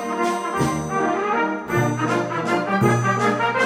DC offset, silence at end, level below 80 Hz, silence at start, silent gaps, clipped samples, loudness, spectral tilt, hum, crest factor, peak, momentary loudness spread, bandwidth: under 0.1%; 0 s; -52 dBFS; 0 s; none; under 0.1%; -21 LUFS; -5.5 dB/octave; none; 16 dB; -4 dBFS; 4 LU; 16.5 kHz